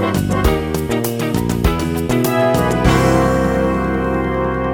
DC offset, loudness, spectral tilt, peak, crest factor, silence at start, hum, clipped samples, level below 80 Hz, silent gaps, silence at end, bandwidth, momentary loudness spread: under 0.1%; -16 LUFS; -6 dB/octave; 0 dBFS; 14 dB; 0 s; none; under 0.1%; -26 dBFS; none; 0 s; 19 kHz; 5 LU